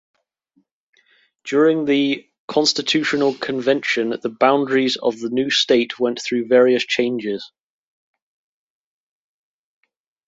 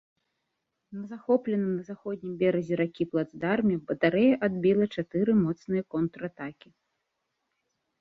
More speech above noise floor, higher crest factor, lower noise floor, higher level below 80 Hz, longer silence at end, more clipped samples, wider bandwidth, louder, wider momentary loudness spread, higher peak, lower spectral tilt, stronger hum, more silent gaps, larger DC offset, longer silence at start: second, 47 dB vs 54 dB; about the same, 18 dB vs 20 dB; second, -65 dBFS vs -81 dBFS; about the same, -68 dBFS vs -66 dBFS; first, 2.8 s vs 1.5 s; neither; first, 8 kHz vs 6.4 kHz; first, -18 LUFS vs -27 LUFS; second, 8 LU vs 14 LU; first, -2 dBFS vs -10 dBFS; second, -3.5 dB/octave vs -9 dB/octave; neither; first, 2.39-2.48 s vs none; neither; first, 1.45 s vs 0.9 s